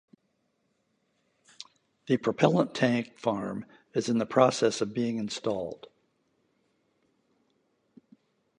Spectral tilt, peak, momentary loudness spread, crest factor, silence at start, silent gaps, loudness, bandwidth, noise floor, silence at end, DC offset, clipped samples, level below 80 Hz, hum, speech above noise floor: -5.5 dB/octave; -6 dBFS; 21 LU; 24 dB; 2.05 s; none; -28 LUFS; 10.5 kHz; -75 dBFS; 2.85 s; under 0.1%; under 0.1%; -70 dBFS; none; 48 dB